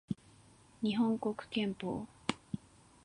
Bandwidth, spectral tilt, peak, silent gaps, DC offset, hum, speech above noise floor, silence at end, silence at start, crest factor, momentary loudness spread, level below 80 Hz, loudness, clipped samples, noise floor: 11 kHz; -6 dB/octave; -12 dBFS; none; under 0.1%; none; 27 dB; 0.5 s; 0.1 s; 26 dB; 12 LU; -68 dBFS; -37 LUFS; under 0.1%; -62 dBFS